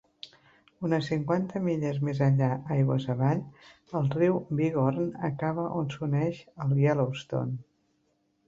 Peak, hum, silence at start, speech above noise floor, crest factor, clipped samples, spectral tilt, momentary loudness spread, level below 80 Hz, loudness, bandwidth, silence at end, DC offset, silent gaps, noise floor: -12 dBFS; none; 0.25 s; 45 dB; 18 dB; under 0.1%; -8.5 dB/octave; 10 LU; -64 dBFS; -28 LUFS; 7.4 kHz; 0.85 s; under 0.1%; none; -72 dBFS